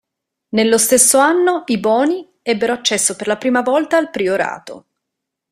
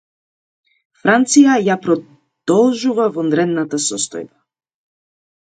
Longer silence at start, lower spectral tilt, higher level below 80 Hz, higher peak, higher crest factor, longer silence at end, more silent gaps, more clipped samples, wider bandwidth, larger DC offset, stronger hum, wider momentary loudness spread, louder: second, 0.55 s vs 1.05 s; second, -2.5 dB/octave vs -4 dB/octave; first, -60 dBFS vs -68 dBFS; about the same, 0 dBFS vs 0 dBFS; about the same, 16 dB vs 16 dB; second, 0.7 s vs 1.25 s; neither; neither; first, 16 kHz vs 9.4 kHz; neither; neither; about the same, 11 LU vs 11 LU; about the same, -15 LUFS vs -15 LUFS